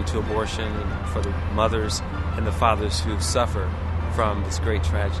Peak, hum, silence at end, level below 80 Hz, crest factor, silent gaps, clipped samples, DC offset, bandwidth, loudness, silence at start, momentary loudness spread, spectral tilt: -4 dBFS; none; 0 s; -30 dBFS; 20 dB; none; under 0.1%; 0.1%; 12 kHz; -24 LUFS; 0 s; 6 LU; -5 dB/octave